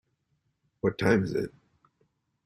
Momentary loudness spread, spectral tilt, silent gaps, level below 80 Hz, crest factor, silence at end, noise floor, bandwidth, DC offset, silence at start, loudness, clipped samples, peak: 9 LU; -7 dB/octave; none; -62 dBFS; 22 dB; 1 s; -76 dBFS; 14 kHz; under 0.1%; 0.85 s; -28 LUFS; under 0.1%; -10 dBFS